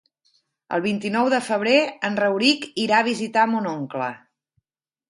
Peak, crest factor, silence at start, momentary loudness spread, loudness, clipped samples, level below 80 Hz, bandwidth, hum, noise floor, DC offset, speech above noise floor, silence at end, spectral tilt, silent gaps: -4 dBFS; 20 dB; 0.7 s; 9 LU; -21 LUFS; under 0.1%; -70 dBFS; 11.5 kHz; none; -87 dBFS; under 0.1%; 66 dB; 0.9 s; -4.5 dB/octave; none